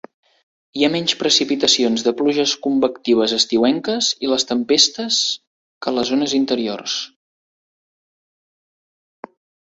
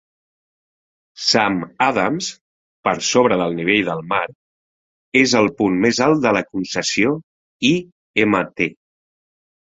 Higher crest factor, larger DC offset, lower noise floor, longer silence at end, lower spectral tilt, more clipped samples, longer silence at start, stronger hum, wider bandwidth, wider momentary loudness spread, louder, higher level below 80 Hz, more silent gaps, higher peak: about the same, 20 dB vs 18 dB; neither; about the same, under -90 dBFS vs under -90 dBFS; first, 2.55 s vs 1 s; second, -2.5 dB/octave vs -4 dB/octave; neither; second, 0.75 s vs 1.2 s; neither; about the same, 8.2 kHz vs 8 kHz; about the same, 9 LU vs 8 LU; about the same, -17 LUFS vs -18 LUFS; second, -62 dBFS vs -56 dBFS; second, 5.47-5.81 s vs 2.41-2.83 s, 4.35-5.12 s, 7.23-7.60 s, 7.92-8.14 s; about the same, 0 dBFS vs 0 dBFS